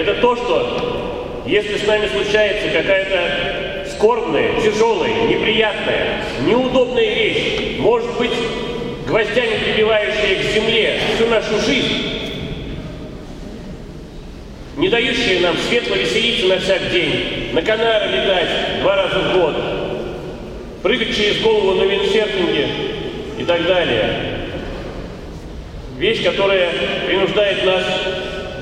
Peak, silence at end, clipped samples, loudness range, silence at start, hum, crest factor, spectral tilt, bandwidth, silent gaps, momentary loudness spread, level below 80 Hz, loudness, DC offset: 0 dBFS; 0 s; under 0.1%; 4 LU; 0 s; none; 18 dB; -4.5 dB/octave; 11.5 kHz; none; 15 LU; -36 dBFS; -17 LUFS; under 0.1%